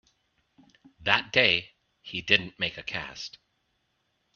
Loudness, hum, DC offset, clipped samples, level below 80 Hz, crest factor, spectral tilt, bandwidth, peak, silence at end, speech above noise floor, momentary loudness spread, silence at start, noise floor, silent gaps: -25 LUFS; none; under 0.1%; under 0.1%; -64 dBFS; 28 dB; -3.5 dB/octave; 7.2 kHz; -2 dBFS; 1.05 s; 48 dB; 16 LU; 1 s; -75 dBFS; none